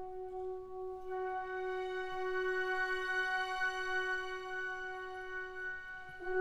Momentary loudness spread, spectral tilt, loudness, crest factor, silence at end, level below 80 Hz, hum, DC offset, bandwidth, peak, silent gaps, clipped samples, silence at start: 10 LU; -3 dB/octave; -39 LUFS; 14 dB; 0 s; -62 dBFS; none; under 0.1%; 12.5 kHz; -26 dBFS; none; under 0.1%; 0 s